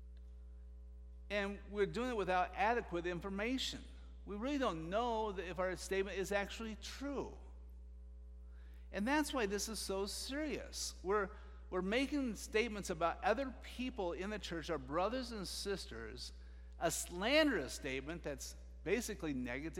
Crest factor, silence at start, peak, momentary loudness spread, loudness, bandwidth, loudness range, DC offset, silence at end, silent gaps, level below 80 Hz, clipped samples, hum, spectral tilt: 22 dB; 0 s; -18 dBFS; 20 LU; -40 LUFS; 16 kHz; 4 LU; under 0.1%; 0 s; none; -54 dBFS; under 0.1%; none; -4 dB/octave